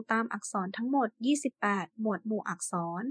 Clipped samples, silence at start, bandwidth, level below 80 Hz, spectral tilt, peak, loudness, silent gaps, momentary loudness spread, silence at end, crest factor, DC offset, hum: under 0.1%; 0 s; 10.5 kHz; under -90 dBFS; -4.5 dB/octave; -12 dBFS; -32 LUFS; none; 4 LU; 0 s; 20 dB; under 0.1%; none